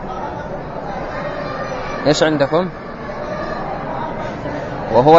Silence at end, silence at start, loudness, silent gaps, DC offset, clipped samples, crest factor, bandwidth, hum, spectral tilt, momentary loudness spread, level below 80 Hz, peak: 0 s; 0 s; -21 LUFS; none; under 0.1%; under 0.1%; 18 dB; 8 kHz; none; -5.5 dB/octave; 12 LU; -38 dBFS; 0 dBFS